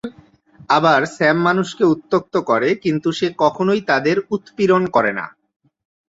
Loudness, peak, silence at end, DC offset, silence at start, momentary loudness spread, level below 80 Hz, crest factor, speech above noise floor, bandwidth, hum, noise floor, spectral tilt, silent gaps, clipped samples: -17 LUFS; -2 dBFS; 0.85 s; under 0.1%; 0.05 s; 6 LU; -60 dBFS; 16 dB; 32 dB; 8 kHz; none; -49 dBFS; -6 dB/octave; none; under 0.1%